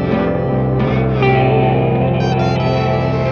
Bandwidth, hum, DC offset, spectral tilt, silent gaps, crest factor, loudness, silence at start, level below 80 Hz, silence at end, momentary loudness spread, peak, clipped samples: 6.6 kHz; none; under 0.1%; -8.5 dB/octave; none; 14 dB; -15 LUFS; 0 s; -32 dBFS; 0 s; 4 LU; 0 dBFS; under 0.1%